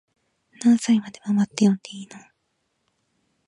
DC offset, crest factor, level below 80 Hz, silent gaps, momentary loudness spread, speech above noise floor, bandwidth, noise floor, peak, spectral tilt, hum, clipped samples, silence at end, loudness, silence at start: under 0.1%; 20 dB; -72 dBFS; none; 19 LU; 52 dB; 11 kHz; -74 dBFS; -4 dBFS; -5.5 dB/octave; none; under 0.1%; 1.3 s; -22 LUFS; 0.6 s